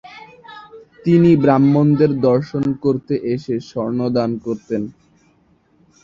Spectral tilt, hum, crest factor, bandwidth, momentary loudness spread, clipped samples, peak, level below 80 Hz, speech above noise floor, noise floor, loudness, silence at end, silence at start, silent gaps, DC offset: -9.5 dB/octave; none; 16 dB; 7.2 kHz; 13 LU; under 0.1%; -2 dBFS; -54 dBFS; 41 dB; -57 dBFS; -17 LUFS; 1.15 s; 0.05 s; none; under 0.1%